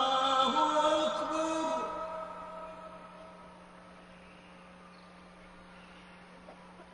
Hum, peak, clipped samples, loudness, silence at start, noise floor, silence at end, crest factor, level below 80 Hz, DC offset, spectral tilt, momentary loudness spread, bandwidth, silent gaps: none; -16 dBFS; under 0.1%; -31 LUFS; 0 s; -54 dBFS; 0 s; 20 dB; -66 dBFS; under 0.1%; -3 dB/octave; 26 LU; 10.5 kHz; none